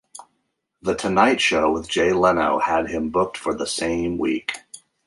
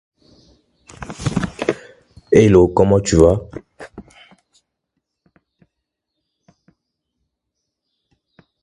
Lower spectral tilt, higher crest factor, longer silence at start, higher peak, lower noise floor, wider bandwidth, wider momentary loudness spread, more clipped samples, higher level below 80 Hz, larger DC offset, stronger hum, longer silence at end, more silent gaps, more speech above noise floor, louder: second, -4 dB/octave vs -6.5 dB/octave; about the same, 20 dB vs 20 dB; second, 0.15 s vs 1 s; about the same, -2 dBFS vs 0 dBFS; second, -73 dBFS vs -78 dBFS; about the same, 11.5 kHz vs 11.5 kHz; second, 9 LU vs 25 LU; neither; second, -48 dBFS vs -36 dBFS; neither; neither; second, 0.3 s vs 4.65 s; neither; second, 53 dB vs 66 dB; second, -21 LUFS vs -15 LUFS